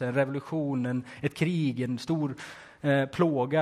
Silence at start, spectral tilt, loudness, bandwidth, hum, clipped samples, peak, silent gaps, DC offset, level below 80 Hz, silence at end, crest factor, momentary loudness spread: 0 s; -7.5 dB/octave; -29 LUFS; 14.5 kHz; none; under 0.1%; -10 dBFS; none; under 0.1%; -64 dBFS; 0 s; 18 dB; 8 LU